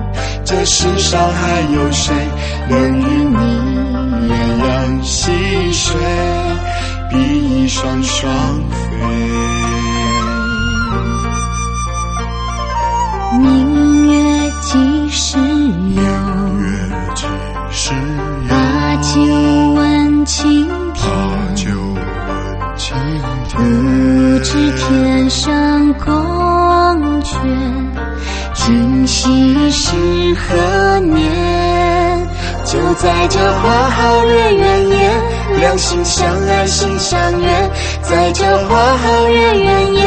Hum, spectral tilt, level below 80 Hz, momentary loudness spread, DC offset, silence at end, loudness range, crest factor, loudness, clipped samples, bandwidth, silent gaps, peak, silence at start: none; -5 dB/octave; -22 dBFS; 9 LU; under 0.1%; 0 s; 5 LU; 12 dB; -13 LUFS; under 0.1%; 8.8 kHz; none; 0 dBFS; 0 s